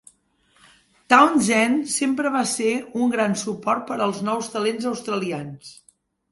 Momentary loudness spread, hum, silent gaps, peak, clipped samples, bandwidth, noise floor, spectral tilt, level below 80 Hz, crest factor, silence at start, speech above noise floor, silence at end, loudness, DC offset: 11 LU; none; none; 0 dBFS; under 0.1%; 11.5 kHz; -62 dBFS; -4 dB/octave; -66 dBFS; 22 dB; 1.1 s; 41 dB; 0.6 s; -21 LUFS; under 0.1%